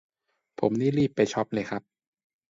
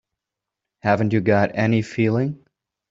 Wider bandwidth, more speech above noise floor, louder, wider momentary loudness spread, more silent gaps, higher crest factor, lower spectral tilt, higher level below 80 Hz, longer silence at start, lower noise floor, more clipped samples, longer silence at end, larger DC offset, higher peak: about the same, 7.8 kHz vs 7.8 kHz; second, 22 dB vs 66 dB; second, -27 LUFS vs -20 LUFS; about the same, 9 LU vs 9 LU; neither; about the same, 20 dB vs 18 dB; second, -6.5 dB/octave vs -8 dB/octave; second, -64 dBFS vs -58 dBFS; second, 0.6 s vs 0.85 s; second, -48 dBFS vs -85 dBFS; neither; first, 0.7 s vs 0.55 s; neither; second, -8 dBFS vs -4 dBFS